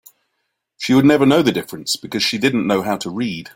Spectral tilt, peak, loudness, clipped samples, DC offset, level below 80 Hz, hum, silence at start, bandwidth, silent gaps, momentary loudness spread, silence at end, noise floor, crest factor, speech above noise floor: -5 dB/octave; -2 dBFS; -17 LUFS; under 0.1%; under 0.1%; -56 dBFS; none; 0.8 s; 17 kHz; none; 11 LU; 0.05 s; -73 dBFS; 16 dB; 57 dB